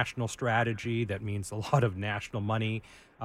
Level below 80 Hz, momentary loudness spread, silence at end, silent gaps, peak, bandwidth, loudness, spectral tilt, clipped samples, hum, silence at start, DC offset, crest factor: -58 dBFS; 7 LU; 0 s; none; -10 dBFS; 14.5 kHz; -31 LUFS; -6 dB/octave; under 0.1%; none; 0 s; under 0.1%; 20 dB